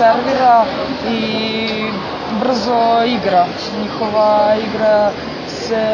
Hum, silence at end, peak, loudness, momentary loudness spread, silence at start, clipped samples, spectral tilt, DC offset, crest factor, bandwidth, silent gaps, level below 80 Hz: none; 0 s; 0 dBFS; -15 LUFS; 9 LU; 0 s; under 0.1%; -5.5 dB/octave; under 0.1%; 14 dB; 7.2 kHz; none; -46 dBFS